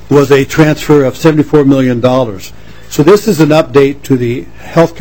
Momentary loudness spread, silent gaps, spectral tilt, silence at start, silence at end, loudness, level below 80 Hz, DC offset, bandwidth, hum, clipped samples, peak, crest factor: 9 LU; none; -6.5 dB/octave; 0.1 s; 0 s; -9 LUFS; -36 dBFS; 3%; 17.5 kHz; none; 5%; 0 dBFS; 8 dB